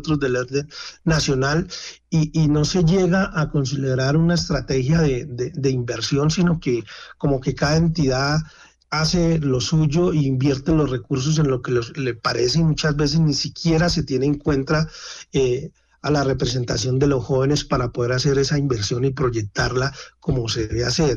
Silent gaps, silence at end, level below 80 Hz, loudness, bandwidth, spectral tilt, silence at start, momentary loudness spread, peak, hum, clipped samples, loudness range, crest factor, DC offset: none; 0 s; -38 dBFS; -20 LUFS; 7.6 kHz; -5.5 dB/octave; 0 s; 7 LU; -8 dBFS; none; under 0.1%; 2 LU; 12 dB; under 0.1%